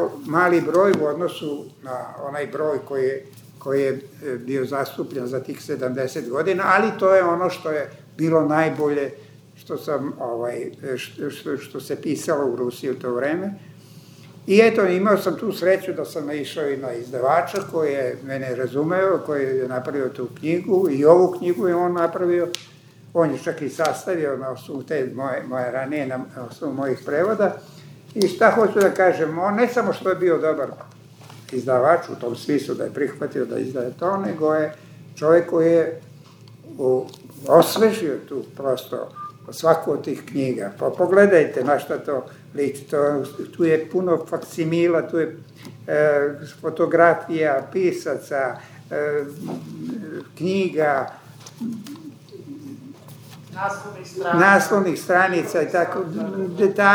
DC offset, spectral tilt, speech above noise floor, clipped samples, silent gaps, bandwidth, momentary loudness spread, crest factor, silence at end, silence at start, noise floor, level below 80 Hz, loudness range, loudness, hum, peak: under 0.1%; -6 dB/octave; 24 dB; under 0.1%; none; over 20 kHz; 15 LU; 22 dB; 0 s; 0 s; -45 dBFS; -76 dBFS; 7 LU; -21 LUFS; none; 0 dBFS